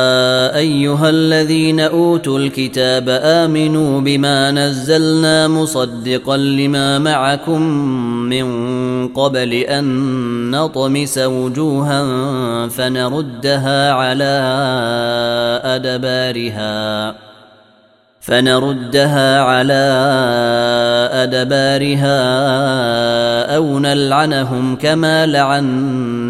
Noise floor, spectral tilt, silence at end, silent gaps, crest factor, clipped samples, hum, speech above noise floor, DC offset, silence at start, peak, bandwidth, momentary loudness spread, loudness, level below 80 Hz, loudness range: -51 dBFS; -5 dB/octave; 0 s; none; 14 dB; under 0.1%; none; 37 dB; under 0.1%; 0 s; 0 dBFS; 15.5 kHz; 6 LU; -14 LUFS; -52 dBFS; 4 LU